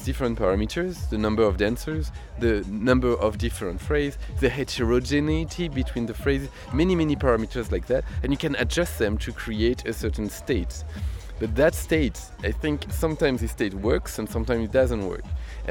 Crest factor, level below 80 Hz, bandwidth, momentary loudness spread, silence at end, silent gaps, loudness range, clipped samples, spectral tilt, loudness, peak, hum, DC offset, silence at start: 18 dB; -32 dBFS; 18 kHz; 9 LU; 0 s; none; 2 LU; under 0.1%; -6 dB/octave; -25 LUFS; -6 dBFS; none; under 0.1%; 0 s